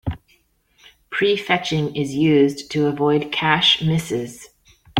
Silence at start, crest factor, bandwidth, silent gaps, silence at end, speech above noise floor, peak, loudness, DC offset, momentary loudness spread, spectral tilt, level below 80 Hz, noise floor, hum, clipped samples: 0.05 s; 20 dB; 16 kHz; none; 0 s; 42 dB; -2 dBFS; -19 LUFS; under 0.1%; 12 LU; -5 dB/octave; -48 dBFS; -61 dBFS; none; under 0.1%